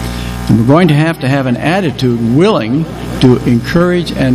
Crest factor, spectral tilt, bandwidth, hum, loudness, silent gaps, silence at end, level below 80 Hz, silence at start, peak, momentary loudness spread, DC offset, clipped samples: 10 dB; -7 dB/octave; 15 kHz; none; -11 LUFS; none; 0 s; -30 dBFS; 0 s; 0 dBFS; 8 LU; under 0.1%; 0.4%